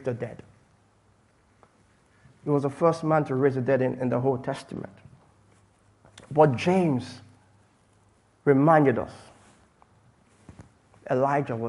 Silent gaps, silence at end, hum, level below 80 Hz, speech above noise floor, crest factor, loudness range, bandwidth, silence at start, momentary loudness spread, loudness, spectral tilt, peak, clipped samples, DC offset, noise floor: none; 0 s; none; -64 dBFS; 39 dB; 22 dB; 4 LU; 11.5 kHz; 0 s; 19 LU; -24 LUFS; -8 dB/octave; -6 dBFS; under 0.1%; under 0.1%; -62 dBFS